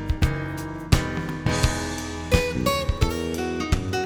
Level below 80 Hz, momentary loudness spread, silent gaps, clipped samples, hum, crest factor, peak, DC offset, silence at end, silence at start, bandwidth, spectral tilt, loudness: -30 dBFS; 7 LU; none; under 0.1%; none; 22 dB; -2 dBFS; under 0.1%; 0 s; 0 s; over 20 kHz; -5 dB/octave; -25 LUFS